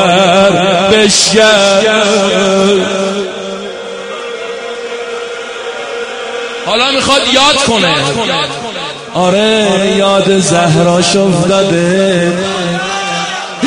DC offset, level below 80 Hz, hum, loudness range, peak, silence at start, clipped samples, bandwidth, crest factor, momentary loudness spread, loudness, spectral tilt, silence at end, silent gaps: under 0.1%; -44 dBFS; none; 9 LU; 0 dBFS; 0 s; 0.1%; 11 kHz; 10 dB; 14 LU; -10 LUFS; -3.5 dB/octave; 0 s; none